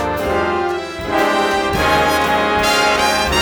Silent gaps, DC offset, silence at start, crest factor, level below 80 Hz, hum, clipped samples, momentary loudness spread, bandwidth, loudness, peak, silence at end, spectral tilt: none; under 0.1%; 0 s; 14 dB; -34 dBFS; none; under 0.1%; 6 LU; over 20 kHz; -15 LUFS; -2 dBFS; 0 s; -3.5 dB/octave